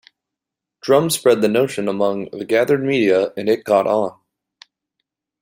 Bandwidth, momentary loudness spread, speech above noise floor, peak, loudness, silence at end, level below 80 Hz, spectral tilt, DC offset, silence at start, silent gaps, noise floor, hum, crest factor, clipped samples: 16 kHz; 6 LU; 67 dB; -2 dBFS; -18 LUFS; 1.3 s; -64 dBFS; -5 dB/octave; under 0.1%; 0.85 s; none; -84 dBFS; none; 16 dB; under 0.1%